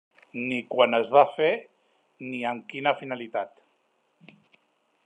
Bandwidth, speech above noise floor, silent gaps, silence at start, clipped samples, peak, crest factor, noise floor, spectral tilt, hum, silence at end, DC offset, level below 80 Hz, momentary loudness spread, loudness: 8.6 kHz; 45 dB; none; 0.35 s; under 0.1%; -4 dBFS; 24 dB; -70 dBFS; -6 dB/octave; none; 1.6 s; under 0.1%; -82 dBFS; 16 LU; -25 LUFS